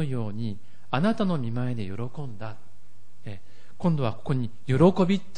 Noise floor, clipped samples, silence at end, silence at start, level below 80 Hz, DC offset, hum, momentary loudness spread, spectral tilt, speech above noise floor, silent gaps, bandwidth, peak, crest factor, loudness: -59 dBFS; under 0.1%; 0.15 s; 0 s; -54 dBFS; 3%; none; 22 LU; -8.5 dB/octave; 33 dB; none; 10 kHz; -8 dBFS; 18 dB; -27 LUFS